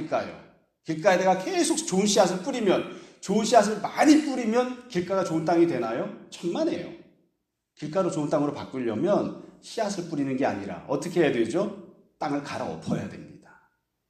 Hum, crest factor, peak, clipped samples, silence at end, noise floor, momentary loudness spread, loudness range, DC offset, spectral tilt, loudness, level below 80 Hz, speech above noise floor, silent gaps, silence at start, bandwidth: none; 22 dB; -4 dBFS; under 0.1%; 0.7 s; -78 dBFS; 14 LU; 6 LU; under 0.1%; -5 dB/octave; -26 LUFS; -68 dBFS; 53 dB; none; 0 s; 13.5 kHz